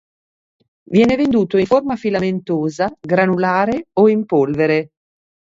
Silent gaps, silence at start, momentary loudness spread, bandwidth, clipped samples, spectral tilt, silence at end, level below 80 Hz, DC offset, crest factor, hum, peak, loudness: none; 0.9 s; 6 LU; 7.6 kHz; under 0.1%; -7.5 dB/octave; 0.7 s; -50 dBFS; under 0.1%; 16 dB; none; 0 dBFS; -16 LUFS